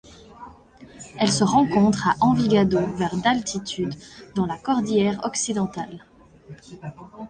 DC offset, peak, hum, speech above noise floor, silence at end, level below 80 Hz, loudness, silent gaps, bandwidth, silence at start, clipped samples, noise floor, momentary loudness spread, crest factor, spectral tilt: under 0.1%; -4 dBFS; none; 25 dB; 0 s; -52 dBFS; -22 LUFS; none; 10 kHz; 0.3 s; under 0.1%; -47 dBFS; 20 LU; 18 dB; -5 dB/octave